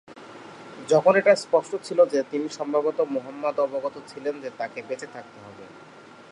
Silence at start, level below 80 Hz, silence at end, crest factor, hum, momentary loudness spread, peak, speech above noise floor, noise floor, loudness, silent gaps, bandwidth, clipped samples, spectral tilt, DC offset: 0.1 s; -76 dBFS; 0.5 s; 20 dB; none; 24 LU; -4 dBFS; 23 dB; -47 dBFS; -24 LUFS; none; 11 kHz; under 0.1%; -5 dB/octave; under 0.1%